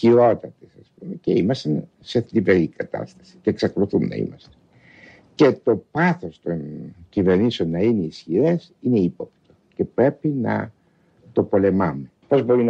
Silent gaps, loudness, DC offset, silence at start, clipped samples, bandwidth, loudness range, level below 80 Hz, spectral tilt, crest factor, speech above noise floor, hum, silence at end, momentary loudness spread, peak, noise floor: none; -21 LUFS; under 0.1%; 0 s; under 0.1%; 7.8 kHz; 2 LU; -58 dBFS; -8 dB/octave; 18 dB; 38 dB; none; 0 s; 16 LU; -4 dBFS; -58 dBFS